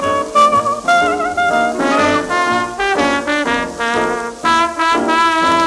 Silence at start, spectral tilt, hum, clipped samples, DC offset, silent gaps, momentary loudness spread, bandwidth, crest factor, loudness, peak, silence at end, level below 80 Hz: 0 s; -3 dB/octave; none; under 0.1%; under 0.1%; none; 5 LU; 13 kHz; 14 dB; -14 LUFS; 0 dBFS; 0 s; -44 dBFS